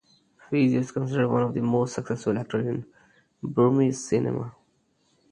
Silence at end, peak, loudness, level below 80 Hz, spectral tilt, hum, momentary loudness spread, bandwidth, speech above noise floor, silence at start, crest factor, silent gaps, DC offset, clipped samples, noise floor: 0.8 s; -8 dBFS; -25 LUFS; -64 dBFS; -7 dB/octave; none; 9 LU; 10.5 kHz; 44 dB; 0.5 s; 18 dB; none; under 0.1%; under 0.1%; -68 dBFS